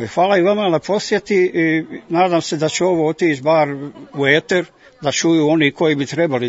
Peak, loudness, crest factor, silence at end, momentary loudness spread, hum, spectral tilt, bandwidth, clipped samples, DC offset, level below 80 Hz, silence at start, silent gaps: 0 dBFS; -16 LUFS; 16 dB; 0 s; 7 LU; none; -5 dB/octave; 8 kHz; under 0.1%; under 0.1%; -60 dBFS; 0 s; none